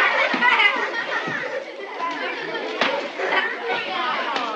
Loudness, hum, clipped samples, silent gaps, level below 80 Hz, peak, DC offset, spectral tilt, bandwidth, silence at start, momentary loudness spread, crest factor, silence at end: -22 LUFS; none; under 0.1%; none; -86 dBFS; -4 dBFS; under 0.1%; -2.5 dB/octave; 9.4 kHz; 0 s; 11 LU; 18 dB; 0 s